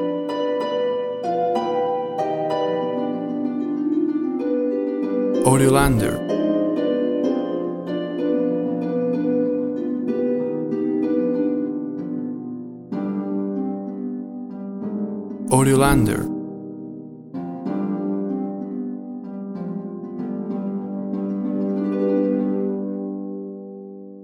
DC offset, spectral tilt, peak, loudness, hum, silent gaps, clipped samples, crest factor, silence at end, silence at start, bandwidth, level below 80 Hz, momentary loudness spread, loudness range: under 0.1%; -6.5 dB/octave; -2 dBFS; -23 LUFS; none; none; under 0.1%; 20 dB; 0 s; 0 s; 16.5 kHz; -42 dBFS; 13 LU; 8 LU